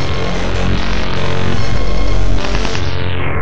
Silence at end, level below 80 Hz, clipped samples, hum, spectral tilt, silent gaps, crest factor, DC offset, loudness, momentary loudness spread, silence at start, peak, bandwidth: 0 s; -20 dBFS; under 0.1%; none; -5.5 dB/octave; none; 16 dB; 30%; -18 LUFS; 1 LU; 0 s; 0 dBFS; 8.4 kHz